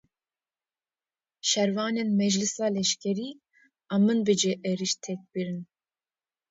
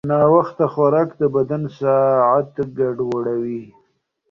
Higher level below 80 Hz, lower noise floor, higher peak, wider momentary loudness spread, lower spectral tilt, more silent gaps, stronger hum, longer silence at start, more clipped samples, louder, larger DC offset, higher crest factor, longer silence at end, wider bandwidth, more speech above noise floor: second, -74 dBFS vs -58 dBFS; first, under -90 dBFS vs -65 dBFS; second, -12 dBFS vs -2 dBFS; about the same, 10 LU vs 9 LU; second, -4 dB/octave vs -10 dB/octave; neither; neither; first, 1.45 s vs 0.05 s; neither; second, -27 LUFS vs -18 LUFS; neither; about the same, 18 dB vs 16 dB; first, 0.85 s vs 0.65 s; first, 8 kHz vs 6.6 kHz; first, over 63 dB vs 48 dB